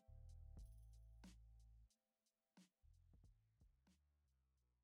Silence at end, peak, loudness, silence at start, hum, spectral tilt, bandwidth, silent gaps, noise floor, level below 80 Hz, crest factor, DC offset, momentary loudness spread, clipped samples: 0 s; -52 dBFS; -66 LUFS; 0 s; none; -5.5 dB/octave; 15 kHz; none; under -90 dBFS; -68 dBFS; 14 dB; under 0.1%; 4 LU; under 0.1%